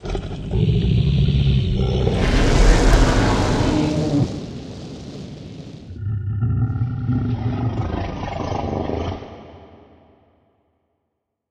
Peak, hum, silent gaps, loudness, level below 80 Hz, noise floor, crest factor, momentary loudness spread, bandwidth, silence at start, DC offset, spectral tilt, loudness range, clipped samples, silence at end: 0 dBFS; none; none; -20 LUFS; -24 dBFS; -76 dBFS; 20 dB; 18 LU; 11 kHz; 0 s; under 0.1%; -6.5 dB/octave; 10 LU; under 0.1%; 1.85 s